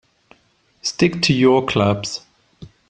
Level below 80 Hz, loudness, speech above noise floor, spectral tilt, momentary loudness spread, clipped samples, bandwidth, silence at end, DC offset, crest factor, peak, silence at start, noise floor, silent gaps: -50 dBFS; -18 LUFS; 43 dB; -5 dB/octave; 12 LU; under 0.1%; 9.8 kHz; 0.2 s; under 0.1%; 18 dB; -2 dBFS; 0.85 s; -60 dBFS; none